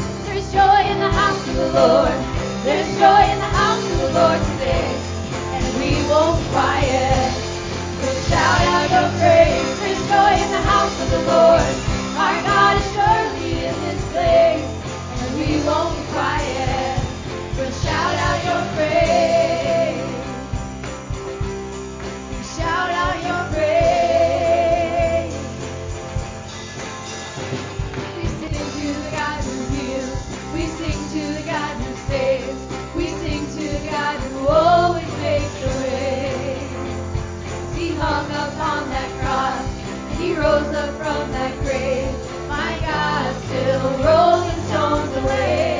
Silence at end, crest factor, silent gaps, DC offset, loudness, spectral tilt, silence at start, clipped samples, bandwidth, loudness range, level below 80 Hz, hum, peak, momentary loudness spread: 0 s; 16 dB; none; under 0.1%; -19 LUFS; -5 dB/octave; 0 s; under 0.1%; 7.6 kHz; 9 LU; -32 dBFS; none; -4 dBFS; 13 LU